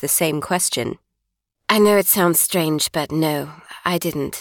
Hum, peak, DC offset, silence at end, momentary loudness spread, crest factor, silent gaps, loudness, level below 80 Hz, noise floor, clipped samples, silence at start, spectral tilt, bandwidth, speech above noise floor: none; -4 dBFS; under 0.1%; 0 s; 13 LU; 16 dB; none; -18 LUFS; -56 dBFS; -78 dBFS; under 0.1%; 0 s; -3.5 dB/octave; 18 kHz; 59 dB